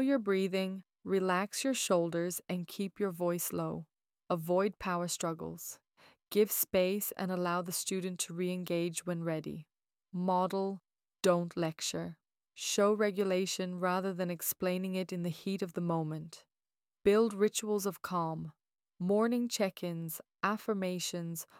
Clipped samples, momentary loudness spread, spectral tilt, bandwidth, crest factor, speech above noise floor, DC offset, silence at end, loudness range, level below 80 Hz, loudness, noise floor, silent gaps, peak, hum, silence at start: under 0.1%; 10 LU; -4.5 dB/octave; 18 kHz; 20 dB; over 57 dB; under 0.1%; 0.15 s; 3 LU; -72 dBFS; -34 LUFS; under -90 dBFS; none; -16 dBFS; none; 0 s